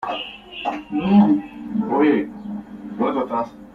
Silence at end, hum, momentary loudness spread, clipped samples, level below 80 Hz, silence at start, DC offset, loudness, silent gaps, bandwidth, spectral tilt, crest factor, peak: 0.05 s; none; 17 LU; under 0.1%; -54 dBFS; 0 s; under 0.1%; -21 LUFS; none; 4.8 kHz; -8.5 dB/octave; 16 dB; -4 dBFS